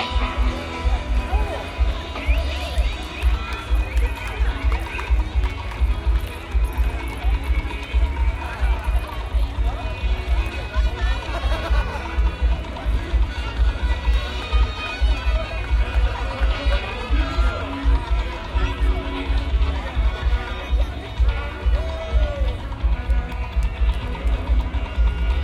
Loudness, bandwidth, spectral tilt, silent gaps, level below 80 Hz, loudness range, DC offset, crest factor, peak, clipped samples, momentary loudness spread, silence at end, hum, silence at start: -24 LUFS; 11.5 kHz; -6 dB/octave; none; -22 dBFS; 1 LU; under 0.1%; 14 dB; -8 dBFS; under 0.1%; 3 LU; 0 s; none; 0 s